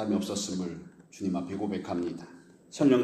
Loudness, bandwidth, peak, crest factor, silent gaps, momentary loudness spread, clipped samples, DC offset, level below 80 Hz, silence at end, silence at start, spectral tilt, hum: -32 LUFS; 13.5 kHz; -12 dBFS; 20 dB; none; 17 LU; under 0.1%; under 0.1%; -66 dBFS; 0 s; 0 s; -5.5 dB/octave; none